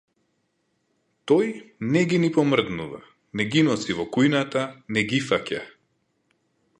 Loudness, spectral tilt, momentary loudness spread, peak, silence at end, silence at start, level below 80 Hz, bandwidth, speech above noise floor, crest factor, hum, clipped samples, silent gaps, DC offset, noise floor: -23 LUFS; -5.5 dB/octave; 13 LU; -6 dBFS; 1.1 s; 1.25 s; -60 dBFS; 11 kHz; 49 dB; 20 dB; none; under 0.1%; none; under 0.1%; -72 dBFS